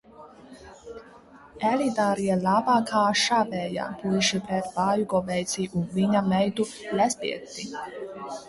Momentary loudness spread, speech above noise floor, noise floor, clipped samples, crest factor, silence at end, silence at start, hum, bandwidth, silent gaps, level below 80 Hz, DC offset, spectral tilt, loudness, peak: 14 LU; 25 dB; -50 dBFS; under 0.1%; 16 dB; 0 s; 0.2 s; none; 11.5 kHz; none; -60 dBFS; under 0.1%; -4.5 dB/octave; -25 LUFS; -10 dBFS